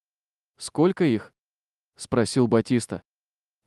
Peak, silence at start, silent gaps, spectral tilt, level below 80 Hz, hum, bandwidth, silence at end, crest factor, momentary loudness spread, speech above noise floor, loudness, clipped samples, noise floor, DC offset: -8 dBFS; 0.6 s; 1.39-1.43 s; -6 dB/octave; -60 dBFS; 50 Hz at -55 dBFS; 12.5 kHz; 0.65 s; 18 dB; 16 LU; over 67 dB; -23 LUFS; under 0.1%; under -90 dBFS; under 0.1%